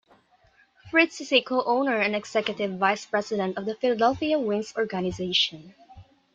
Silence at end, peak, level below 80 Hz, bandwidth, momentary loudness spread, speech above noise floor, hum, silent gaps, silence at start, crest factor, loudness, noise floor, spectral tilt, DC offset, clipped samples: 0.35 s; -6 dBFS; -60 dBFS; 9 kHz; 6 LU; 36 dB; none; none; 0.85 s; 20 dB; -25 LUFS; -61 dBFS; -4 dB/octave; under 0.1%; under 0.1%